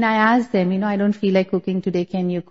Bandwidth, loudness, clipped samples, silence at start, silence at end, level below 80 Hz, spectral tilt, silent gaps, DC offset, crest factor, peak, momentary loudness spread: 7.6 kHz; -20 LUFS; under 0.1%; 0 s; 0.1 s; -62 dBFS; -8 dB/octave; none; 0.2%; 14 dB; -4 dBFS; 6 LU